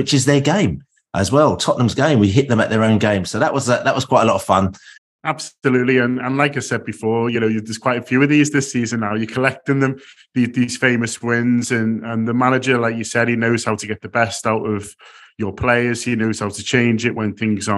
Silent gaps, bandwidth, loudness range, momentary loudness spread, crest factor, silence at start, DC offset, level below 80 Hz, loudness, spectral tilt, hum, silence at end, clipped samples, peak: 4.98-5.19 s; 12.5 kHz; 4 LU; 8 LU; 18 dB; 0 s; under 0.1%; -50 dBFS; -18 LUFS; -5.5 dB/octave; none; 0 s; under 0.1%; 0 dBFS